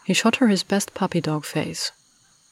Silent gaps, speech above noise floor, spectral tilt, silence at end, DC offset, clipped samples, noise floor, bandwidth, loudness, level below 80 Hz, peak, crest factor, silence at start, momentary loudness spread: none; 37 dB; -4.5 dB/octave; 0.6 s; under 0.1%; under 0.1%; -59 dBFS; 16 kHz; -23 LUFS; -64 dBFS; -8 dBFS; 16 dB; 0.05 s; 9 LU